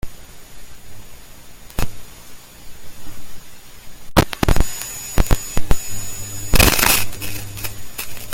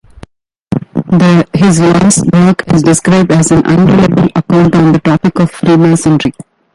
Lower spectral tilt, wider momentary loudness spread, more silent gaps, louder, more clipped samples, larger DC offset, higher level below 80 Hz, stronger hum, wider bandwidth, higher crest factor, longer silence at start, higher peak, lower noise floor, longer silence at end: second, -3.5 dB/octave vs -6 dB/octave; first, 27 LU vs 5 LU; neither; second, -20 LUFS vs -8 LUFS; second, under 0.1% vs 0.2%; neither; first, -26 dBFS vs -36 dBFS; neither; first, 17 kHz vs 11.5 kHz; first, 18 dB vs 8 dB; second, 0.05 s vs 0.7 s; about the same, 0 dBFS vs 0 dBFS; about the same, -37 dBFS vs -37 dBFS; second, 0 s vs 0.35 s